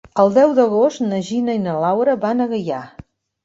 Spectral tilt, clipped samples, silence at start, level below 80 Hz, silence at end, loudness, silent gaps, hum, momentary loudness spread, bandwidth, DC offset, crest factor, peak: -7 dB/octave; under 0.1%; 0.15 s; -56 dBFS; 0.55 s; -17 LUFS; none; none; 9 LU; 8 kHz; under 0.1%; 16 dB; -2 dBFS